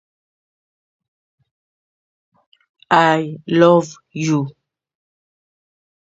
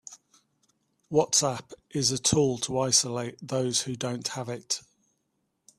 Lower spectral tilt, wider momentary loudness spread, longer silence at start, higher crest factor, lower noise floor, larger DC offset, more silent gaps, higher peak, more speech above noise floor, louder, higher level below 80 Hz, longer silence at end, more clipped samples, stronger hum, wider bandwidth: first, -6 dB/octave vs -3 dB/octave; about the same, 13 LU vs 12 LU; first, 2.9 s vs 0.1 s; about the same, 20 dB vs 22 dB; first, under -90 dBFS vs -77 dBFS; neither; neither; first, 0 dBFS vs -8 dBFS; first, over 75 dB vs 49 dB; first, -16 LUFS vs -27 LUFS; about the same, -66 dBFS vs -62 dBFS; first, 1.6 s vs 1 s; neither; neither; second, 8 kHz vs 15 kHz